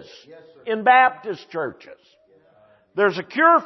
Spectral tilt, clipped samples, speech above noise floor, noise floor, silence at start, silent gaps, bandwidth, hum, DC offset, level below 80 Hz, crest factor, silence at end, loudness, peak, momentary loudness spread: -5.5 dB/octave; under 0.1%; 36 dB; -56 dBFS; 0.3 s; none; 6.2 kHz; none; under 0.1%; -76 dBFS; 18 dB; 0 s; -19 LUFS; -4 dBFS; 17 LU